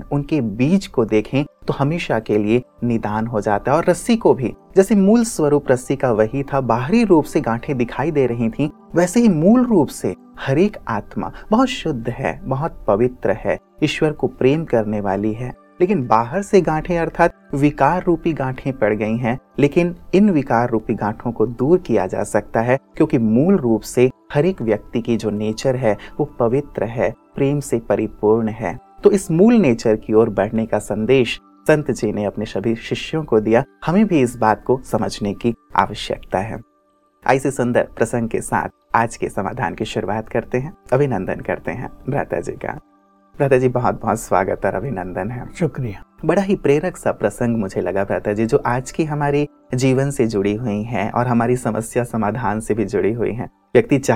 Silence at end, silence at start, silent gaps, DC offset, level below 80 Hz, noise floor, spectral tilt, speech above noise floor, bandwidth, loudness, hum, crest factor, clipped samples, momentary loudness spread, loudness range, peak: 0 s; 0 s; none; under 0.1%; -42 dBFS; -59 dBFS; -6.5 dB/octave; 42 dB; 15.5 kHz; -19 LUFS; none; 18 dB; under 0.1%; 8 LU; 4 LU; 0 dBFS